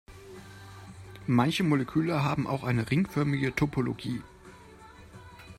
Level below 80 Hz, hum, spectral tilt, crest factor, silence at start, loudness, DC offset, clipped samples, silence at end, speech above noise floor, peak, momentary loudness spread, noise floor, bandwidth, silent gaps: -56 dBFS; none; -7 dB/octave; 18 dB; 0.1 s; -28 LUFS; under 0.1%; under 0.1%; 0.05 s; 23 dB; -12 dBFS; 22 LU; -51 dBFS; 15 kHz; none